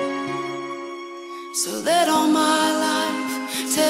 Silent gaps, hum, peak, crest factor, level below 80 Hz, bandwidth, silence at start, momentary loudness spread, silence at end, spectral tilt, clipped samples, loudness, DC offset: none; none; -8 dBFS; 14 dB; -74 dBFS; 16 kHz; 0 s; 15 LU; 0 s; -2 dB/octave; under 0.1%; -21 LUFS; under 0.1%